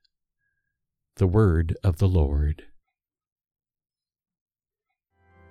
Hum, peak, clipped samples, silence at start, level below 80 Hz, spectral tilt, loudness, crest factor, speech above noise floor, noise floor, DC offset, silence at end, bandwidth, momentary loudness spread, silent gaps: none; -8 dBFS; under 0.1%; 1.2 s; -34 dBFS; -9 dB/octave; -23 LUFS; 20 dB; 64 dB; -85 dBFS; under 0.1%; 2.95 s; 9.6 kHz; 8 LU; none